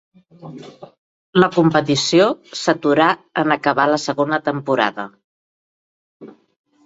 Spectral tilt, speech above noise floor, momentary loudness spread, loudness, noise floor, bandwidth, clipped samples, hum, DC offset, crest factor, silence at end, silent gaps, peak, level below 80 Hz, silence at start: -5 dB/octave; over 72 dB; 18 LU; -17 LUFS; under -90 dBFS; 8 kHz; under 0.1%; none; under 0.1%; 18 dB; 0.55 s; 0.98-1.33 s, 5.24-6.20 s; -2 dBFS; -62 dBFS; 0.45 s